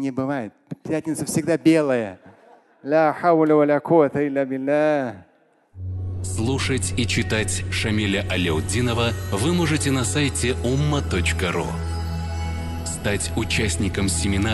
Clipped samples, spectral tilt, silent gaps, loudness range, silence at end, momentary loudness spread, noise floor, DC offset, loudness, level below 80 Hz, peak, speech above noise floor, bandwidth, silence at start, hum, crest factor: under 0.1%; -5 dB/octave; none; 4 LU; 0 s; 10 LU; -52 dBFS; under 0.1%; -22 LUFS; -34 dBFS; -4 dBFS; 31 dB; 12.5 kHz; 0 s; none; 18 dB